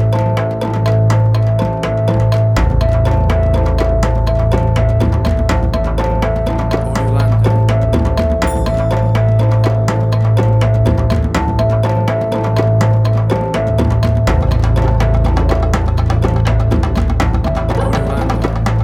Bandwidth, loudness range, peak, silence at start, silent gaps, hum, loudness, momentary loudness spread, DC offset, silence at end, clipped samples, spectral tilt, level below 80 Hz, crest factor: 11.5 kHz; 1 LU; 0 dBFS; 0 s; none; none; -14 LUFS; 4 LU; under 0.1%; 0 s; under 0.1%; -7.5 dB/octave; -18 dBFS; 12 dB